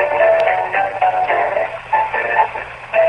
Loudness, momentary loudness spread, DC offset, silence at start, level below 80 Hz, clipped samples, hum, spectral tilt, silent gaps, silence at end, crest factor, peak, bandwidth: -16 LUFS; 7 LU; under 0.1%; 0 s; -50 dBFS; under 0.1%; none; -4.5 dB/octave; none; 0 s; 14 dB; -2 dBFS; 9.6 kHz